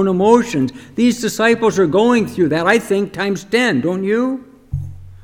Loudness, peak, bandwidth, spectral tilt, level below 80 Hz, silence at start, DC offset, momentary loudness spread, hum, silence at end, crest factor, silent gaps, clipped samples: -16 LUFS; 0 dBFS; 16.5 kHz; -5.5 dB/octave; -42 dBFS; 0 s; under 0.1%; 15 LU; none; 0.05 s; 16 dB; none; under 0.1%